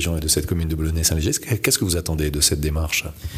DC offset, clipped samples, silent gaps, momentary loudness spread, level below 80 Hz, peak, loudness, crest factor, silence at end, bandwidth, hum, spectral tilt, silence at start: under 0.1%; under 0.1%; none; 5 LU; -30 dBFS; -6 dBFS; -20 LUFS; 16 dB; 0 s; 15.5 kHz; none; -3.5 dB/octave; 0 s